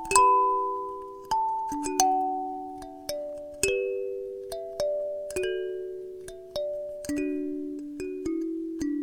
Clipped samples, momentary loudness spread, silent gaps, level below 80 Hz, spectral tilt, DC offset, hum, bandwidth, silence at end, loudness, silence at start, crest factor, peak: under 0.1%; 13 LU; none; -56 dBFS; -2.5 dB/octave; under 0.1%; none; 19 kHz; 0 s; -29 LUFS; 0 s; 26 dB; -4 dBFS